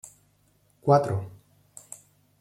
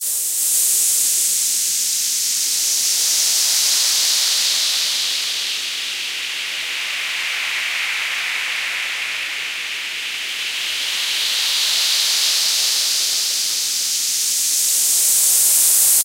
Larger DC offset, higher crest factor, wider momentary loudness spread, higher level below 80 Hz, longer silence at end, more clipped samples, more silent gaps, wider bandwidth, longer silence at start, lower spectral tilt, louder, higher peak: neither; about the same, 22 dB vs 18 dB; first, 24 LU vs 9 LU; first, -64 dBFS vs -70 dBFS; first, 1.1 s vs 0 s; neither; neither; second, 14 kHz vs 16 kHz; first, 0.85 s vs 0 s; first, -7 dB/octave vs 4.5 dB/octave; second, -25 LUFS vs -16 LUFS; second, -8 dBFS vs -2 dBFS